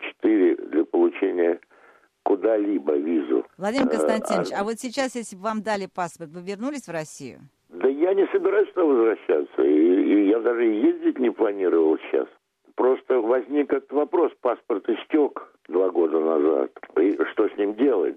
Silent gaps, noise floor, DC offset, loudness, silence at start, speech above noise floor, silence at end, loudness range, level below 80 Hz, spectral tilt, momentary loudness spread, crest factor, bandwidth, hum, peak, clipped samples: none; -56 dBFS; under 0.1%; -23 LUFS; 0 s; 34 dB; 0 s; 6 LU; -72 dBFS; -5.5 dB/octave; 11 LU; 16 dB; 12 kHz; none; -6 dBFS; under 0.1%